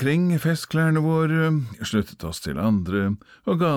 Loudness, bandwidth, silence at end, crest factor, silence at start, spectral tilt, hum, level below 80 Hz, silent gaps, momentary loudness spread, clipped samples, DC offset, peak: -23 LUFS; 16 kHz; 0 s; 12 dB; 0 s; -7 dB/octave; none; -48 dBFS; none; 8 LU; under 0.1%; under 0.1%; -10 dBFS